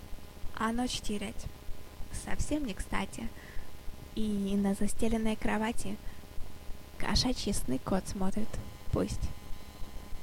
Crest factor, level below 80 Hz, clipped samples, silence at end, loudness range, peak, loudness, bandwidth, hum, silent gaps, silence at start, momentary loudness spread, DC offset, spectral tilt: 18 dB; -40 dBFS; under 0.1%; 0 s; 4 LU; -14 dBFS; -34 LUFS; 16.5 kHz; none; none; 0 s; 18 LU; under 0.1%; -4.5 dB/octave